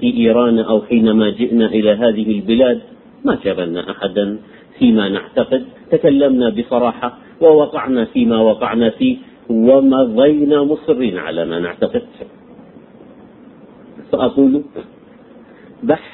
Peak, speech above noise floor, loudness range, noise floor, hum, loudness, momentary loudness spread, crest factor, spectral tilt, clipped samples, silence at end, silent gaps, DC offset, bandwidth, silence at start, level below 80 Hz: 0 dBFS; 28 dB; 7 LU; -41 dBFS; none; -15 LUFS; 10 LU; 14 dB; -11 dB/octave; under 0.1%; 0.05 s; none; under 0.1%; 4.1 kHz; 0 s; -50 dBFS